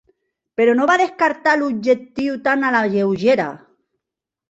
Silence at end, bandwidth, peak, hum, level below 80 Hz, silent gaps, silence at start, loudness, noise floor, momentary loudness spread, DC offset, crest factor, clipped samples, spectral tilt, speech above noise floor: 0.95 s; 8 kHz; -2 dBFS; none; -62 dBFS; none; 0.6 s; -17 LUFS; -85 dBFS; 6 LU; under 0.1%; 16 dB; under 0.1%; -5.5 dB/octave; 68 dB